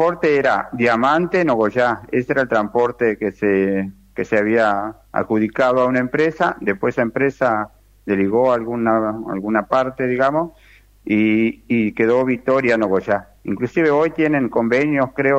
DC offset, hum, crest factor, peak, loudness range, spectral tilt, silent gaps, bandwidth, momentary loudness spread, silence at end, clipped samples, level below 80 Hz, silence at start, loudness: under 0.1%; none; 16 dB; -2 dBFS; 2 LU; -7.5 dB/octave; none; 8.4 kHz; 7 LU; 0 s; under 0.1%; -52 dBFS; 0 s; -18 LUFS